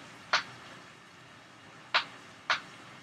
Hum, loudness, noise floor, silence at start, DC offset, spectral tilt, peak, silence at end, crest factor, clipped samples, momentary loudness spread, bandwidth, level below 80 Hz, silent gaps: none; -32 LUFS; -53 dBFS; 0 s; under 0.1%; -1 dB/octave; -12 dBFS; 0 s; 26 dB; under 0.1%; 21 LU; 14.5 kHz; -80 dBFS; none